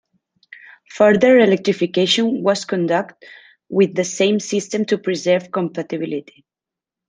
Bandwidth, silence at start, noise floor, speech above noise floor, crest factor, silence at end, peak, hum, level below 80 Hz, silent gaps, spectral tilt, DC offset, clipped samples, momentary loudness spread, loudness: 10 kHz; 0.95 s; -88 dBFS; 70 dB; 18 dB; 0.85 s; 0 dBFS; none; -64 dBFS; none; -4.5 dB/octave; under 0.1%; under 0.1%; 12 LU; -17 LUFS